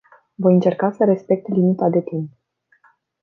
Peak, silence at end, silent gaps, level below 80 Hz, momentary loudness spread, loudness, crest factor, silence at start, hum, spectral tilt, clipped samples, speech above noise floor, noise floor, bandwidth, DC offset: -2 dBFS; 0.95 s; none; -66 dBFS; 12 LU; -18 LUFS; 16 dB; 0.4 s; none; -10.5 dB/octave; under 0.1%; 41 dB; -58 dBFS; 4.3 kHz; under 0.1%